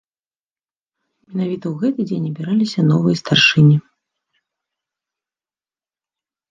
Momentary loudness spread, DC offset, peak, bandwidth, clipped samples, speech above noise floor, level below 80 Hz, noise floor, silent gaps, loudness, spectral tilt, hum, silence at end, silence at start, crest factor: 12 LU; under 0.1%; -2 dBFS; 7.6 kHz; under 0.1%; over 74 dB; -60 dBFS; under -90 dBFS; none; -16 LUFS; -6 dB/octave; none; 2.7 s; 1.3 s; 18 dB